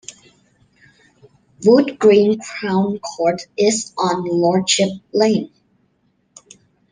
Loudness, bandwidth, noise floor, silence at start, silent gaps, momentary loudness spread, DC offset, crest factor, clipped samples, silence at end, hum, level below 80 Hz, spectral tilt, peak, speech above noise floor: -17 LUFS; 10 kHz; -63 dBFS; 0.1 s; none; 9 LU; under 0.1%; 16 dB; under 0.1%; 1.45 s; none; -62 dBFS; -4.5 dB/octave; -2 dBFS; 47 dB